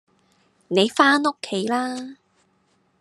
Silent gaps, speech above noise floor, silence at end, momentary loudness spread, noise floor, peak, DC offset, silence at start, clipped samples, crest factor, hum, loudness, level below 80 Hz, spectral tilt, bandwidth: none; 44 dB; 0.9 s; 14 LU; -65 dBFS; -2 dBFS; under 0.1%; 0.7 s; under 0.1%; 22 dB; none; -20 LUFS; -78 dBFS; -4 dB/octave; 12.5 kHz